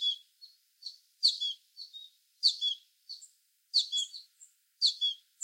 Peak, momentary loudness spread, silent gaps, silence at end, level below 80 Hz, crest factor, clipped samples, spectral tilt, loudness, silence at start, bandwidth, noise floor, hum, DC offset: -14 dBFS; 20 LU; none; 0.3 s; under -90 dBFS; 22 dB; under 0.1%; 10 dB/octave; -30 LUFS; 0 s; 16.5 kHz; -62 dBFS; none; under 0.1%